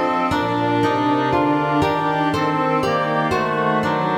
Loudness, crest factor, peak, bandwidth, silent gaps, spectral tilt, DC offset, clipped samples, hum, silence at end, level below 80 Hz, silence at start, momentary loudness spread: -19 LUFS; 14 dB; -6 dBFS; 16 kHz; none; -6.5 dB/octave; under 0.1%; under 0.1%; none; 0 s; -48 dBFS; 0 s; 1 LU